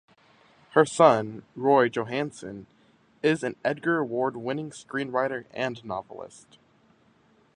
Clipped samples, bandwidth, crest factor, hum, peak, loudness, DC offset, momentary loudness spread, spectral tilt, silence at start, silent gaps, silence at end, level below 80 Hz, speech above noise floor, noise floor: under 0.1%; 10.5 kHz; 24 dB; none; -4 dBFS; -26 LUFS; under 0.1%; 19 LU; -5.5 dB/octave; 0.75 s; none; 1.3 s; -68 dBFS; 36 dB; -62 dBFS